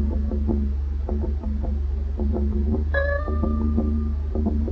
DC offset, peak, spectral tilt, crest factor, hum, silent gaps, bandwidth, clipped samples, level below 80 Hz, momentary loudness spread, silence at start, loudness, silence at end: under 0.1%; -8 dBFS; -10.5 dB/octave; 14 dB; none; none; 4.2 kHz; under 0.1%; -24 dBFS; 4 LU; 0 s; -25 LUFS; 0 s